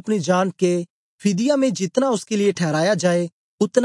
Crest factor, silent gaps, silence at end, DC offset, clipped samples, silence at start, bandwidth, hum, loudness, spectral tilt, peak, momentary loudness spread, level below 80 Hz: 16 dB; 0.90-1.18 s, 3.32-3.58 s; 0 s; under 0.1%; under 0.1%; 0.05 s; 11.5 kHz; none; -20 LUFS; -5.5 dB/octave; -4 dBFS; 6 LU; -72 dBFS